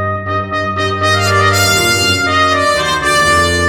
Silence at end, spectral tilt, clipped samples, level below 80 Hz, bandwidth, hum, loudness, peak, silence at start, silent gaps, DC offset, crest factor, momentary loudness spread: 0 s; -3 dB/octave; under 0.1%; -36 dBFS; 20 kHz; none; -11 LUFS; 0 dBFS; 0 s; none; under 0.1%; 12 dB; 7 LU